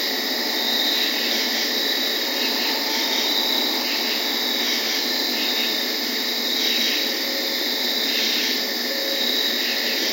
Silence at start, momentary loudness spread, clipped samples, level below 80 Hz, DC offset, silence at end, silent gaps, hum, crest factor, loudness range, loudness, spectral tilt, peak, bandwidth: 0 s; 3 LU; under 0.1%; under -90 dBFS; under 0.1%; 0 s; none; none; 14 dB; 1 LU; -20 LUFS; 0.5 dB/octave; -8 dBFS; 16.5 kHz